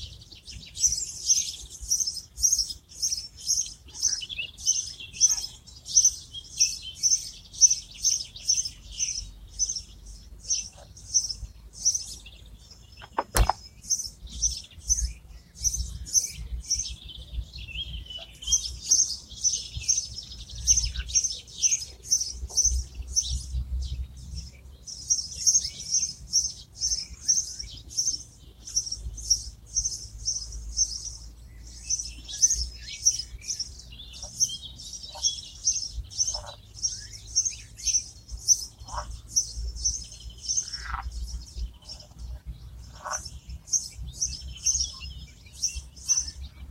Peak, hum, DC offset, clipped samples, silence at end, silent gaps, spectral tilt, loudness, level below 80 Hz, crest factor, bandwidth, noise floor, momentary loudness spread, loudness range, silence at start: -2 dBFS; none; under 0.1%; under 0.1%; 0 s; none; 0 dB/octave; -26 LUFS; -40 dBFS; 28 dB; 16 kHz; -49 dBFS; 18 LU; 6 LU; 0 s